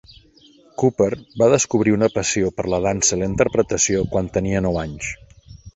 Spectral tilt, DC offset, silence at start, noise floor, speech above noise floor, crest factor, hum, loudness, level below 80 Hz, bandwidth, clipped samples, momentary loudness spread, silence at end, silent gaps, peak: -4.5 dB/octave; under 0.1%; 0.8 s; -51 dBFS; 32 dB; 18 dB; none; -19 LUFS; -40 dBFS; 8.2 kHz; under 0.1%; 9 LU; 0.05 s; none; -2 dBFS